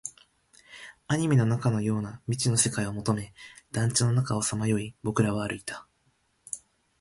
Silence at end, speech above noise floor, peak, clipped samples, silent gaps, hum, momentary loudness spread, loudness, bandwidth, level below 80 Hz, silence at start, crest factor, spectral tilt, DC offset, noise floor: 0.4 s; 43 dB; -8 dBFS; under 0.1%; none; none; 18 LU; -27 LUFS; 11.5 kHz; -56 dBFS; 0.05 s; 20 dB; -5 dB/octave; under 0.1%; -70 dBFS